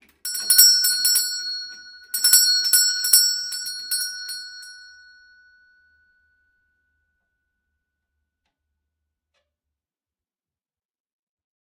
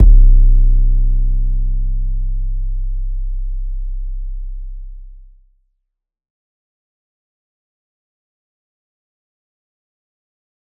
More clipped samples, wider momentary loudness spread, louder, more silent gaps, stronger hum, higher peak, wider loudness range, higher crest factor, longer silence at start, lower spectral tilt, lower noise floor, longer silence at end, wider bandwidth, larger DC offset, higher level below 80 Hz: neither; about the same, 19 LU vs 18 LU; first, -16 LUFS vs -20 LUFS; neither; neither; about the same, 0 dBFS vs 0 dBFS; about the same, 17 LU vs 19 LU; first, 24 dB vs 16 dB; first, 0.25 s vs 0 s; second, 6 dB/octave vs -14.5 dB/octave; first, under -90 dBFS vs -75 dBFS; first, 6.85 s vs 5.5 s; first, 18 kHz vs 0.6 kHz; neither; second, -78 dBFS vs -16 dBFS